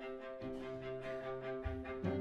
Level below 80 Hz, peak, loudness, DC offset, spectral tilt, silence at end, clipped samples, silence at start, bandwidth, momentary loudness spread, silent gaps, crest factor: -56 dBFS; -26 dBFS; -44 LUFS; under 0.1%; -8 dB/octave; 0 s; under 0.1%; 0 s; 9 kHz; 4 LU; none; 18 dB